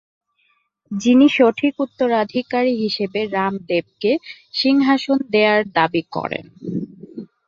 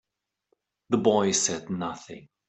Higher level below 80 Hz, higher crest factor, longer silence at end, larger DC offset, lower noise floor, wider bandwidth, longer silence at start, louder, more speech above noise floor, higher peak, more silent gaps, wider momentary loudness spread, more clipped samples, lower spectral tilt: about the same, -64 dBFS vs -68 dBFS; about the same, 18 dB vs 22 dB; about the same, 0.2 s vs 0.3 s; neither; second, -65 dBFS vs -75 dBFS; second, 7.4 kHz vs 8.4 kHz; about the same, 0.9 s vs 0.9 s; first, -18 LUFS vs -25 LUFS; about the same, 47 dB vs 49 dB; first, -2 dBFS vs -6 dBFS; neither; second, 14 LU vs 17 LU; neither; first, -5.5 dB/octave vs -3.5 dB/octave